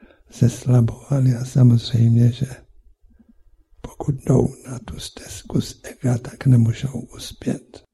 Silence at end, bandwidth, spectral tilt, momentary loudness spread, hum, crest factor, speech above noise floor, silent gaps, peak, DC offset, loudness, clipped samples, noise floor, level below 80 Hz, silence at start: 0.15 s; 12 kHz; -7.5 dB/octave; 17 LU; none; 18 dB; 34 dB; none; -2 dBFS; under 0.1%; -20 LUFS; under 0.1%; -53 dBFS; -44 dBFS; 0.35 s